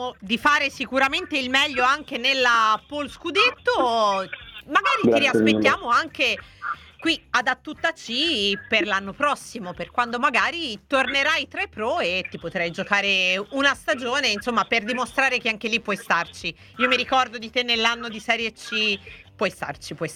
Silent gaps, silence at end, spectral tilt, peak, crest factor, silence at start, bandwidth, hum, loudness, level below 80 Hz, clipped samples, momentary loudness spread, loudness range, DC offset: none; 0 s; -3 dB/octave; -4 dBFS; 20 dB; 0 s; 16.5 kHz; none; -22 LUFS; -56 dBFS; under 0.1%; 10 LU; 3 LU; under 0.1%